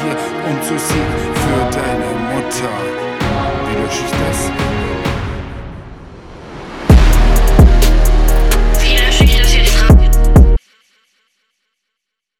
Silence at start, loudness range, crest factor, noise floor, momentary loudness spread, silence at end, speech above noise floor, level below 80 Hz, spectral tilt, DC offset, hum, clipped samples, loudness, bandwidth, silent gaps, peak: 0 s; 8 LU; 12 dB; -77 dBFS; 14 LU; 1.85 s; 61 dB; -14 dBFS; -5 dB/octave; under 0.1%; none; under 0.1%; -14 LUFS; 16 kHz; none; 0 dBFS